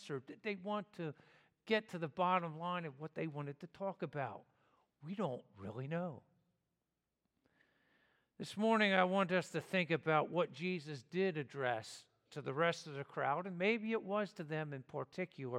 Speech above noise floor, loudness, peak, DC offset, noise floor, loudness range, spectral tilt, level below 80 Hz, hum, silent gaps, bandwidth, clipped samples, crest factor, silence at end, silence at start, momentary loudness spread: 50 dB; -39 LUFS; -16 dBFS; under 0.1%; -89 dBFS; 12 LU; -6 dB/octave; -88 dBFS; none; none; 13 kHz; under 0.1%; 24 dB; 0 s; 0 s; 13 LU